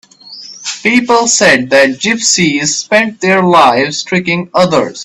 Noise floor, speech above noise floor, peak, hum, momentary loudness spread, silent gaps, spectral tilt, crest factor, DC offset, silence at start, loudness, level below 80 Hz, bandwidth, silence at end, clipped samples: -32 dBFS; 22 dB; 0 dBFS; none; 7 LU; none; -3 dB/octave; 10 dB; under 0.1%; 0.25 s; -9 LUFS; -50 dBFS; 13.5 kHz; 0 s; 0.2%